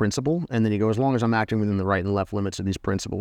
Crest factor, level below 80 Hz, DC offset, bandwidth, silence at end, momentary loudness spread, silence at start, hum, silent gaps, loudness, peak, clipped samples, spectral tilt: 14 dB; -52 dBFS; under 0.1%; 12.5 kHz; 0 s; 5 LU; 0 s; none; none; -24 LUFS; -10 dBFS; under 0.1%; -6.5 dB/octave